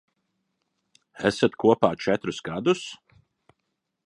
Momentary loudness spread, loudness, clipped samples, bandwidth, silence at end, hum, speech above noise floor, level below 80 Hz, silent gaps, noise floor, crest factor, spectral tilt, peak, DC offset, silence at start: 8 LU; -24 LUFS; under 0.1%; 11.5 kHz; 1.1 s; none; 56 dB; -62 dBFS; none; -79 dBFS; 24 dB; -5.5 dB/octave; -2 dBFS; under 0.1%; 1.15 s